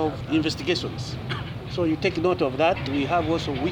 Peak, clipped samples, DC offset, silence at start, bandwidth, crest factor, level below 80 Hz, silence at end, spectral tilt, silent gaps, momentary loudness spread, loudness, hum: -10 dBFS; under 0.1%; under 0.1%; 0 s; 19 kHz; 14 dB; -44 dBFS; 0 s; -6 dB/octave; none; 9 LU; -25 LUFS; none